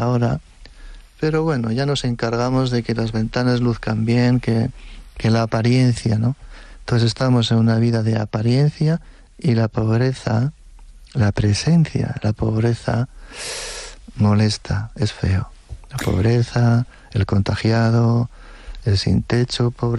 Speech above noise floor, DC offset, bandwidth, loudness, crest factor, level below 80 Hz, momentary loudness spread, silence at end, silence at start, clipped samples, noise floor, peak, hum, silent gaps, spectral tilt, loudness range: 23 dB; under 0.1%; 11.5 kHz; -19 LUFS; 12 dB; -38 dBFS; 10 LU; 0 s; 0 s; under 0.1%; -41 dBFS; -8 dBFS; none; none; -6.5 dB/octave; 3 LU